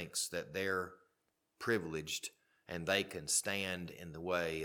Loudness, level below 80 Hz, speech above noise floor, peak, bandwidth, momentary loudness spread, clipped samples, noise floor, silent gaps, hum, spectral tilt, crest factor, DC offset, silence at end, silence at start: -38 LUFS; -68 dBFS; 44 dB; -16 dBFS; 19 kHz; 12 LU; under 0.1%; -82 dBFS; none; none; -2.5 dB/octave; 24 dB; under 0.1%; 0 s; 0 s